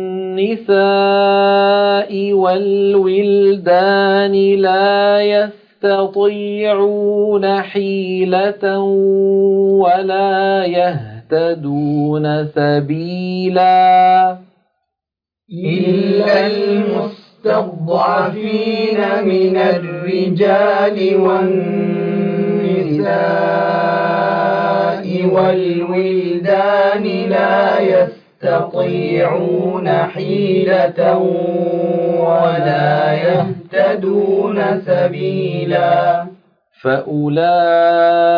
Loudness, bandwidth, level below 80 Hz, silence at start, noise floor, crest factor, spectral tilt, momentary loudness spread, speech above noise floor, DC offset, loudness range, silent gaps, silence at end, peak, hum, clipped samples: -14 LUFS; 5.2 kHz; -62 dBFS; 0 s; -86 dBFS; 12 dB; -9 dB/octave; 6 LU; 72 dB; under 0.1%; 3 LU; none; 0 s; -2 dBFS; none; under 0.1%